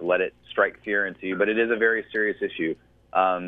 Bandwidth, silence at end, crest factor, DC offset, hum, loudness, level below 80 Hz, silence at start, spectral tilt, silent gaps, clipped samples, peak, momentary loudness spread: 4.4 kHz; 0 s; 18 dB; under 0.1%; none; -25 LUFS; -64 dBFS; 0 s; -7.5 dB/octave; none; under 0.1%; -6 dBFS; 7 LU